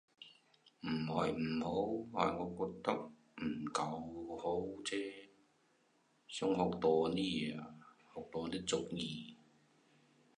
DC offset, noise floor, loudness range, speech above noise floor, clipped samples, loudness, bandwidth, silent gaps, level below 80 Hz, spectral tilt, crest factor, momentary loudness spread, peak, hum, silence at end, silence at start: under 0.1%; -75 dBFS; 4 LU; 36 dB; under 0.1%; -39 LUFS; 10.5 kHz; none; -68 dBFS; -5 dB/octave; 24 dB; 18 LU; -16 dBFS; none; 1.05 s; 0.2 s